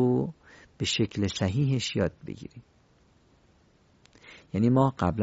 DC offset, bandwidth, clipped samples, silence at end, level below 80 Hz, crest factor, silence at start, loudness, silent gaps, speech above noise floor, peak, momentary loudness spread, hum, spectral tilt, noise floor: under 0.1%; 8 kHz; under 0.1%; 0 s; -48 dBFS; 20 dB; 0 s; -27 LUFS; none; 36 dB; -10 dBFS; 18 LU; none; -6 dB/octave; -62 dBFS